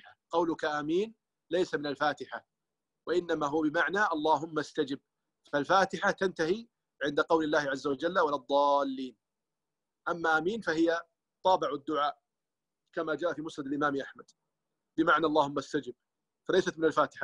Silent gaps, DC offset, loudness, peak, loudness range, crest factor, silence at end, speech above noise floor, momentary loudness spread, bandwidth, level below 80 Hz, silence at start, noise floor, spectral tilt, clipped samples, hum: none; under 0.1%; -30 LUFS; -12 dBFS; 3 LU; 20 dB; 0 s; over 60 dB; 11 LU; 10.5 kHz; -70 dBFS; 0.3 s; under -90 dBFS; -5 dB/octave; under 0.1%; none